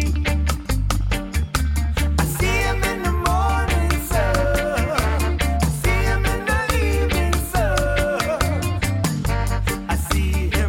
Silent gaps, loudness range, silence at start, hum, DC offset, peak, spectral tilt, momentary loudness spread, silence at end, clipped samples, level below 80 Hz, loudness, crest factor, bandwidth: none; 1 LU; 0 s; none; under 0.1%; -10 dBFS; -5 dB/octave; 3 LU; 0 s; under 0.1%; -24 dBFS; -21 LUFS; 10 dB; 17 kHz